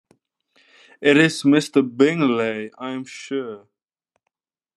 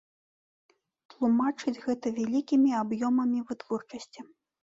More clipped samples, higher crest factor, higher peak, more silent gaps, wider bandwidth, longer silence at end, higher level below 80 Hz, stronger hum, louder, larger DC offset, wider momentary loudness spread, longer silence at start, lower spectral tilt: neither; first, 20 dB vs 14 dB; first, -2 dBFS vs -16 dBFS; neither; first, 12 kHz vs 7.8 kHz; first, 1.2 s vs 0.55 s; about the same, -74 dBFS vs -72 dBFS; neither; first, -19 LUFS vs -28 LUFS; neither; about the same, 15 LU vs 17 LU; second, 1 s vs 1.2 s; about the same, -5.5 dB/octave vs -6 dB/octave